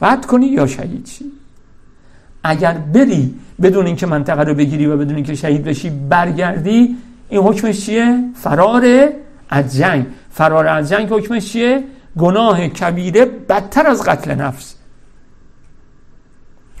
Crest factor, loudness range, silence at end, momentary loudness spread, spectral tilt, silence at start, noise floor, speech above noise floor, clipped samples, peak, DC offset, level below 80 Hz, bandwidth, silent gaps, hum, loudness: 14 dB; 3 LU; 0 s; 9 LU; -6.5 dB/octave; 0 s; -42 dBFS; 29 dB; under 0.1%; 0 dBFS; under 0.1%; -44 dBFS; 14.5 kHz; none; none; -14 LUFS